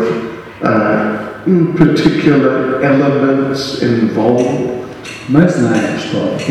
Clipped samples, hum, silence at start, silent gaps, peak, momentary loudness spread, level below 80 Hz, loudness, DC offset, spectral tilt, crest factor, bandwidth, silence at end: 0.1%; none; 0 s; none; 0 dBFS; 9 LU; -44 dBFS; -13 LUFS; under 0.1%; -7 dB/octave; 12 dB; 12.5 kHz; 0 s